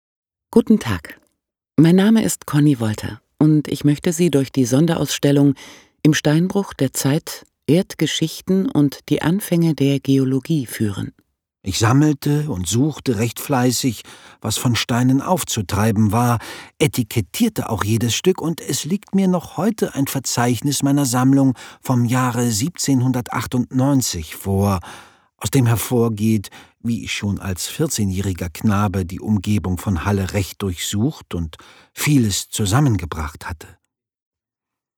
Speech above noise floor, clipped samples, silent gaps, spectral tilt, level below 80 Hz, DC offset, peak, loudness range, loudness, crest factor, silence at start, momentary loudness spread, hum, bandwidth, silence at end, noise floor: 67 dB; under 0.1%; none; -5.5 dB/octave; -44 dBFS; under 0.1%; -2 dBFS; 4 LU; -19 LUFS; 18 dB; 0.5 s; 9 LU; none; over 20 kHz; 1.3 s; -86 dBFS